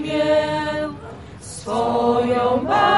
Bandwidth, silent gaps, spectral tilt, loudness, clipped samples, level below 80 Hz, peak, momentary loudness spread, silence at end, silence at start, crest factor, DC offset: 11.5 kHz; none; -5 dB/octave; -20 LUFS; under 0.1%; -48 dBFS; -4 dBFS; 17 LU; 0 s; 0 s; 14 dB; 0.2%